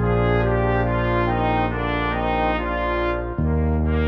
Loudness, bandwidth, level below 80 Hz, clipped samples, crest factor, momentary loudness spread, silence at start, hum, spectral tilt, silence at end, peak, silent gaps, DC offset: -21 LUFS; 5.6 kHz; -28 dBFS; under 0.1%; 12 dB; 4 LU; 0 s; none; -9.5 dB/octave; 0 s; -8 dBFS; none; under 0.1%